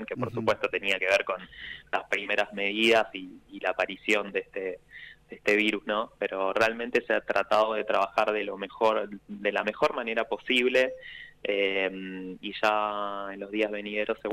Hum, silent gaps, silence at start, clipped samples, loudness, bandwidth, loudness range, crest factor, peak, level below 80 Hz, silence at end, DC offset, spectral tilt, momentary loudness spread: 50 Hz at -65 dBFS; none; 0 s; under 0.1%; -28 LUFS; 16 kHz; 2 LU; 16 dB; -12 dBFS; -64 dBFS; 0 s; under 0.1%; -4 dB/octave; 13 LU